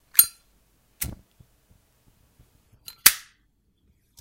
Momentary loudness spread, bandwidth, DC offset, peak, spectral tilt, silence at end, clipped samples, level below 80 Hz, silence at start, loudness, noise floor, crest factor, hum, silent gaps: 18 LU; 16.5 kHz; under 0.1%; 0 dBFS; 1 dB/octave; 1.05 s; under 0.1%; -54 dBFS; 0.15 s; -20 LUFS; -67 dBFS; 28 dB; none; none